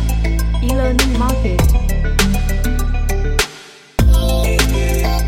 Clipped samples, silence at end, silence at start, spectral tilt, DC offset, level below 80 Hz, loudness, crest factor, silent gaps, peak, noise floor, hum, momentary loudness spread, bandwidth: under 0.1%; 0 s; 0 s; -5 dB/octave; under 0.1%; -16 dBFS; -17 LUFS; 14 dB; none; 0 dBFS; -38 dBFS; none; 5 LU; 17 kHz